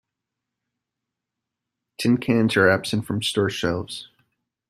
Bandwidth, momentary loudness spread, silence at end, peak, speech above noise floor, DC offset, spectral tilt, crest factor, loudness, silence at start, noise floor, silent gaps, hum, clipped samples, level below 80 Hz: 14 kHz; 11 LU; 0.65 s; -4 dBFS; 63 dB; under 0.1%; -5 dB/octave; 20 dB; -22 LUFS; 2 s; -84 dBFS; none; none; under 0.1%; -58 dBFS